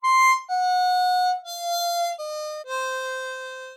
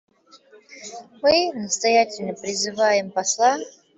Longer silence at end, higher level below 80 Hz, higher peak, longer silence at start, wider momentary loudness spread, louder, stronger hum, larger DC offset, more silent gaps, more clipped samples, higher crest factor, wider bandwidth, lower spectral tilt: second, 0 s vs 0.25 s; second, under -90 dBFS vs -62 dBFS; second, -10 dBFS vs -4 dBFS; second, 0 s vs 0.7 s; second, 12 LU vs 19 LU; second, -24 LUFS vs -21 LUFS; neither; neither; neither; neither; about the same, 14 dB vs 18 dB; first, 17.5 kHz vs 8.4 kHz; second, 6 dB/octave vs -2 dB/octave